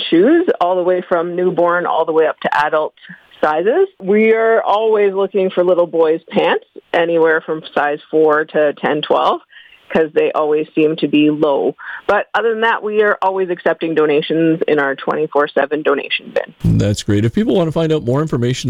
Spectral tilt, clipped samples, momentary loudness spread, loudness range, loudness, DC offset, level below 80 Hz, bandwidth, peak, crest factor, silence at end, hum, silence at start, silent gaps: -6.5 dB/octave; under 0.1%; 5 LU; 2 LU; -15 LUFS; under 0.1%; -44 dBFS; 11.5 kHz; -2 dBFS; 12 dB; 0 s; none; 0 s; none